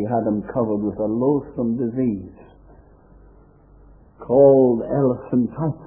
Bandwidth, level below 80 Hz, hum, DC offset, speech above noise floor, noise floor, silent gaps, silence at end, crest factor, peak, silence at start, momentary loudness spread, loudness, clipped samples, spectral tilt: 2.8 kHz; -50 dBFS; none; under 0.1%; 30 dB; -49 dBFS; none; 0 s; 18 dB; -2 dBFS; 0 s; 11 LU; -20 LUFS; under 0.1%; -14.5 dB/octave